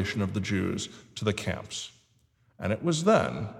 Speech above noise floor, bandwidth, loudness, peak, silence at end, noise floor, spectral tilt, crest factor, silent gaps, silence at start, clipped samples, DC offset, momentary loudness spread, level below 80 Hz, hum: 38 dB; 15 kHz; -29 LUFS; -8 dBFS; 0 s; -66 dBFS; -5 dB/octave; 20 dB; none; 0 s; under 0.1%; under 0.1%; 14 LU; -56 dBFS; none